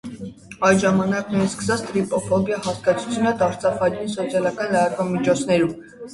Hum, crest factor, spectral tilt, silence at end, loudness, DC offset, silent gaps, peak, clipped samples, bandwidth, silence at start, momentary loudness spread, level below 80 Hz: none; 18 dB; -5.5 dB/octave; 0 s; -21 LUFS; under 0.1%; none; -2 dBFS; under 0.1%; 11.5 kHz; 0.05 s; 6 LU; -52 dBFS